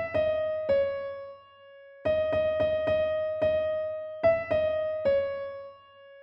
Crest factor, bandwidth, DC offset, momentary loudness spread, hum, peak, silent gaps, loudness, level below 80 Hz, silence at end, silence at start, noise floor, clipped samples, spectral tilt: 16 dB; 5.6 kHz; under 0.1%; 12 LU; none; -12 dBFS; none; -28 LUFS; -56 dBFS; 0 s; 0 s; -52 dBFS; under 0.1%; -7.5 dB/octave